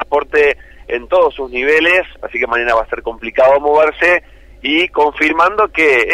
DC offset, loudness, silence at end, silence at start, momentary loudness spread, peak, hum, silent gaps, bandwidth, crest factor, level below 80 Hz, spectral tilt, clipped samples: under 0.1%; -13 LUFS; 0 s; 0 s; 12 LU; -2 dBFS; none; none; 12.5 kHz; 12 dB; -40 dBFS; -4 dB/octave; under 0.1%